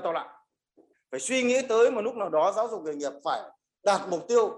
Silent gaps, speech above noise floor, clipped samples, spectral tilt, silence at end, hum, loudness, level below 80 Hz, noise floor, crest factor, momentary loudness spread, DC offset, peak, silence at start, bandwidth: none; 38 dB; under 0.1%; -3 dB/octave; 0 s; none; -27 LUFS; -80 dBFS; -64 dBFS; 16 dB; 11 LU; under 0.1%; -10 dBFS; 0 s; 11.5 kHz